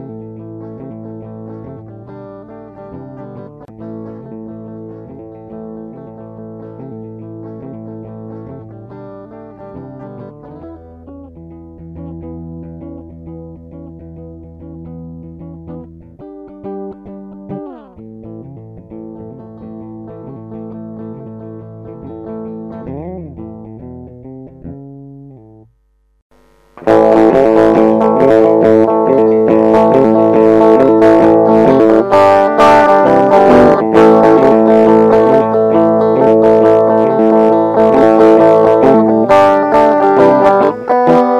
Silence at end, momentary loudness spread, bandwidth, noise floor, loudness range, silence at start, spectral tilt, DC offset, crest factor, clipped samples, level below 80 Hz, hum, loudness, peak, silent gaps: 0 s; 25 LU; 9.4 kHz; -56 dBFS; 24 LU; 0 s; -8 dB/octave; under 0.1%; 12 dB; 0.7%; -44 dBFS; none; -8 LUFS; 0 dBFS; 26.22-26.30 s